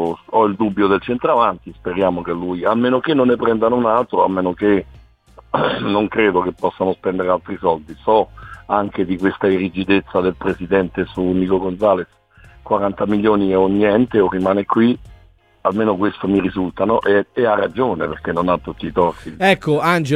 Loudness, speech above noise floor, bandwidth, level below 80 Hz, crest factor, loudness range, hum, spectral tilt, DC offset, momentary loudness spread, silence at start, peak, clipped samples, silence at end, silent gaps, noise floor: -18 LUFS; 32 dB; 12.5 kHz; -46 dBFS; 16 dB; 2 LU; none; -7.5 dB/octave; under 0.1%; 6 LU; 0 s; -2 dBFS; under 0.1%; 0 s; none; -49 dBFS